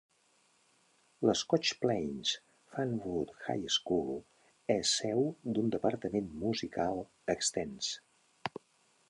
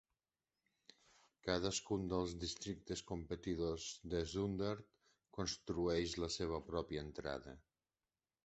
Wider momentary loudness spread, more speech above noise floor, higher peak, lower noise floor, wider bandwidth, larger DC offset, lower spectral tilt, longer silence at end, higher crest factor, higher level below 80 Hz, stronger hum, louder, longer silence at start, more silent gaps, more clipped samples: first, 13 LU vs 8 LU; second, 37 dB vs over 48 dB; first, -12 dBFS vs -20 dBFS; second, -71 dBFS vs under -90 dBFS; first, 11.5 kHz vs 8.2 kHz; neither; about the same, -3.5 dB/octave vs -4.5 dB/octave; second, 0.6 s vs 0.85 s; about the same, 22 dB vs 24 dB; second, -66 dBFS vs -60 dBFS; neither; first, -34 LUFS vs -43 LUFS; second, 1.2 s vs 1.45 s; neither; neither